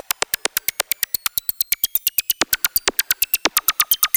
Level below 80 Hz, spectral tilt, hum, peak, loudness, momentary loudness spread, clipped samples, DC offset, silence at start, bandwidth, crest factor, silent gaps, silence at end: -54 dBFS; 1 dB/octave; none; -2 dBFS; -19 LUFS; 5 LU; under 0.1%; under 0.1%; 0.55 s; over 20 kHz; 18 dB; none; 0.1 s